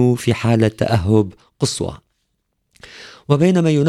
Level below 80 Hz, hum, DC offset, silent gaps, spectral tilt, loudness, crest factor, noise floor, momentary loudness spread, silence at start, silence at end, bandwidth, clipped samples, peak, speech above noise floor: -44 dBFS; none; under 0.1%; none; -6.5 dB/octave; -17 LUFS; 16 dB; -70 dBFS; 16 LU; 0 s; 0 s; 14 kHz; under 0.1%; -2 dBFS; 54 dB